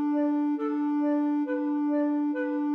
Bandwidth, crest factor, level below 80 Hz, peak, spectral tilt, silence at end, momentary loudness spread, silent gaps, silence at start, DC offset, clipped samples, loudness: 3.4 kHz; 8 dB; under -90 dBFS; -18 dBFS; -7 dB/octave; 0 s; 2 LU; none; 0 s; under 0.1%; under 0.1%; -27 LUFS